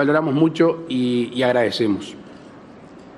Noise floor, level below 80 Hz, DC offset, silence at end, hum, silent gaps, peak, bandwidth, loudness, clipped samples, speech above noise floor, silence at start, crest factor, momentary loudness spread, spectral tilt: -42 dBFS; -62 dBFS; under 0.1%; 0 s; none; none; -4 dBFS; 11.5 kHz; -19 LUFS; under 0.1%; 23 dB; 0 s; 16 dB; 9 LU; -6.5 dB/octave